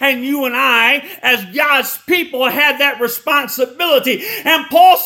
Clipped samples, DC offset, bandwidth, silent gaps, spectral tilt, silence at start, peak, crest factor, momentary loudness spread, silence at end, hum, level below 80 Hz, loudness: under 0.1%; under 0.1%; 18 kHz; none; -1.5 dB/octave; 0 s; 0 dBFS; 14 dB; 7 LU; 0 s; none; -64 dBFS; -13 LUFS